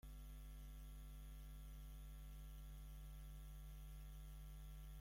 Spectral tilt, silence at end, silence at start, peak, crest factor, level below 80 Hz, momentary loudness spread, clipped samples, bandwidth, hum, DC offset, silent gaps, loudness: -5 dB/octave; 0 s; 0.05 s; -48 dBFS; 8 dB; -56 dBFS; 0 LU; under 0.1%; 16.5 kHz; none; under 0.1%; none; -59 LUFS